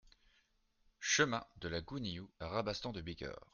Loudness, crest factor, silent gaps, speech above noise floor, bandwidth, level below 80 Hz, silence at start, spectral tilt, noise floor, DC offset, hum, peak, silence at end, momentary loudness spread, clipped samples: -39 LUFS; 24 dB; none; 35 dB; 10.5 kHz; -62 dBFS; 1 s; -3 dB/octave; -76 dBFS; under 0.1%; none; -18 dBFS; 0.1 s; 13 LU; under 0.1%